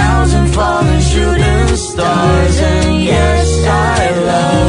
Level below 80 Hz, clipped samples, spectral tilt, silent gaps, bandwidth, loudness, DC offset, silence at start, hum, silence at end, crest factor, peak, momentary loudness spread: -18 dBFS; under 0.1%; -5.5 dB/octave; none; 11 kHz; -11 LUFS; under 0.1%; 0 s; none; 0 s; 10 dB; 0 dBFS; 2 LU